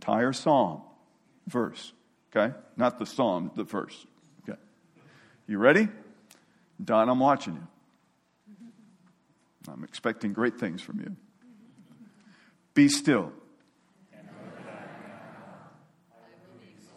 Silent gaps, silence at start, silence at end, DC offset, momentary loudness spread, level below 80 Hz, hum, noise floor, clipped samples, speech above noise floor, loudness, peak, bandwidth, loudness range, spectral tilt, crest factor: none; 0 s; 1.4 s; under 0.1%; 25 LU; -76 dBFS; none; -69 dBFS; under 0.1%; 43 dB; -27 LUFS; -4 dBFS; 13.5 kHz; 9 LU; -5 dB/octave; 26 dB